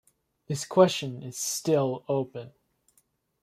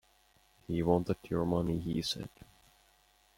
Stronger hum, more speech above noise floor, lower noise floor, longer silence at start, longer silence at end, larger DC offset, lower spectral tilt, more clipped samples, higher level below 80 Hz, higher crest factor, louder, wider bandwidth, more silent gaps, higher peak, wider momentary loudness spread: neither; first, 43 dB vs 35 dB; about the same, -70 dBFS vs -68 dBFS; second, 0.5 s vs 0.7 s; second, 0.95 s vs 1.1 s; neither; second, -4.5 dB/octave vs -6.5 dB/octave; neither; second, -70 dBFS vs -56 dBFS; about the same, 22 dB vs 22 dB; first, -27 LUFS vs -33 LUFS; about the same, 15.5 kHz vs 16.5 kHz; neither; first, -6 dBFS vs -14 dBFS; first, 14 LU vs 8 LU